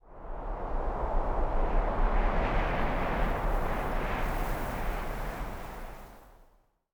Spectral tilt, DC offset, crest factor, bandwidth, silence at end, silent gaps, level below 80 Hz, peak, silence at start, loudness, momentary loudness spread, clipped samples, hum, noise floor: -6.5 dB/octave; under 0.1%; 14 dB; over 20 kHz; 0.6 s; none; -32 dBFS; -16 dBFS; 0.05 s; -33 LUFS; 13 LU; under 0.1%; none; -64 dBFS